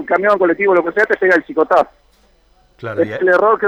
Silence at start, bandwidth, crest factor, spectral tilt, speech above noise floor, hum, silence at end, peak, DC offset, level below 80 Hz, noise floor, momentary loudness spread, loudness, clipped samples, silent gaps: 0 s; 8.6 kHz; 12 dB; -6.5 dB/octave; 39 dB; none; 0 s; -2 dBFS; under 0.1%; -54 dBFS; -53 dBFS; 9 LU; -14 LUFS; under 0.1%; none